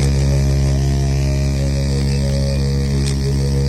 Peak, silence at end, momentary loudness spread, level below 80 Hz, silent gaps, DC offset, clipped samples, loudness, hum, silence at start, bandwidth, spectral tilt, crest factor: -6 dBFS; 0 s; 2 LU; -20 dBFS; none; under 0.1%; under 0.1%; -17 LUFS; none; 0 s; 12.5 kHz; -6.5 dB/octave; 10 dB